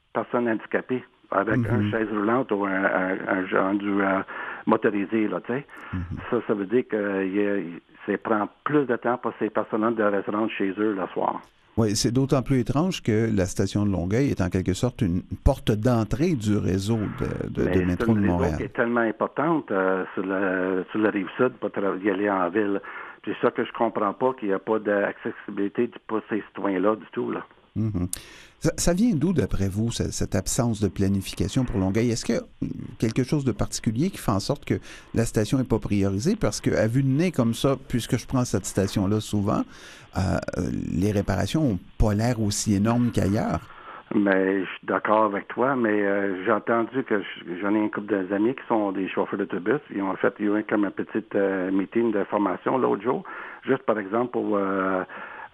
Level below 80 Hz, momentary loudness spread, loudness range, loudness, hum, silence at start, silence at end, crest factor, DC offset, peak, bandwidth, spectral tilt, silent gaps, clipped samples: -42 dBFS; 7 LU; 2 LU; -25 LUFS; none; 0.15 s; 0.05 s; 20 dB; under 0.1%; -4 dBFS; 14.5 kHz; -6 dB/octave; none; under 0.1%